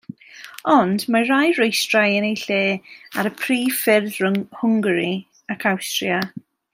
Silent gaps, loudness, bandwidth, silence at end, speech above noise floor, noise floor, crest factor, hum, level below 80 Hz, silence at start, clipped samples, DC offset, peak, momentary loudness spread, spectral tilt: none; -19 LUFS; 16 kHz; 0.35 s; 22 dB; -41 dBFS; 18 dB; none; -68 dBFS; 0.35 s; under 0.1%; under 0.1%; -2 dBFS; 13 LU; -4 dB/octave